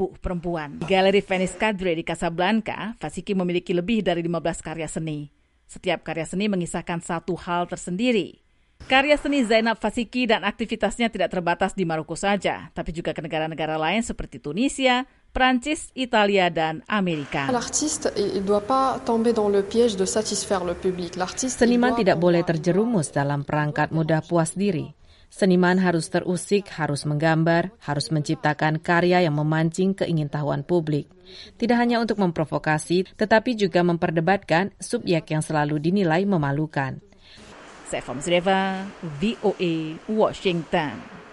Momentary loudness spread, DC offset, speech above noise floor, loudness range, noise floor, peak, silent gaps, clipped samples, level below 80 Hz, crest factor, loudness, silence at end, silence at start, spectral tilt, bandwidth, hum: 9 LU; under 0.1%; 24 dB; 4 LU; -47 dBFS; -4 dBFS; none; under 0.1%; -48 dBFS; 18 dB; -23 LUFS; 0 s; 0 s; -5 dB/octave; 11.5 kHz; none